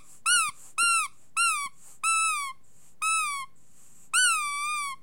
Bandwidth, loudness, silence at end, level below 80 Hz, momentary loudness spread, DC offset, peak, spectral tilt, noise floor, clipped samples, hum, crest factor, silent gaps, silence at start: 16.5 kHz; -25 LUFS; 0.1 s; -74 dBFS; 9 LU; 0.5%; -12 dBFS; 4 dB/octave; -60 dBFS; under 0.1%; none; 18 dB; none; 0.25 s